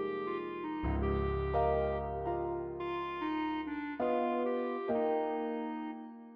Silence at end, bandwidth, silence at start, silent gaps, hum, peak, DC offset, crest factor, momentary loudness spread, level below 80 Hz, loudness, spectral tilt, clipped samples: 0 s; 5.6 kHz; 0 s; none; none; -20 dBFS; under 0.1%; 14 dB; 7 LU; -46 dBFS; -35 LUFS; -6 dB/octave; under 0.1%